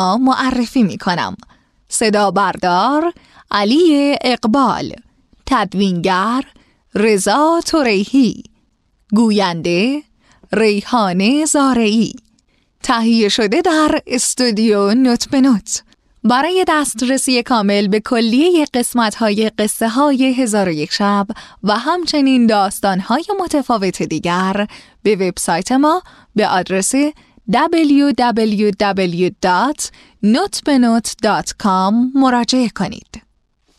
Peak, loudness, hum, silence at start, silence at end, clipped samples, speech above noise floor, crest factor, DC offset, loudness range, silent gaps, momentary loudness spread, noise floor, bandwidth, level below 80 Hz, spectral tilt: -2 dBFS; -15 LUFS; none; 0 s; 0.6 s; under 0.1%; 45 dB; 14 dB; under 0.1%; 2 LU; none; 7 LU; -60 dBFS; 14 kHz; -48 dBFS; -4.5 dB/octave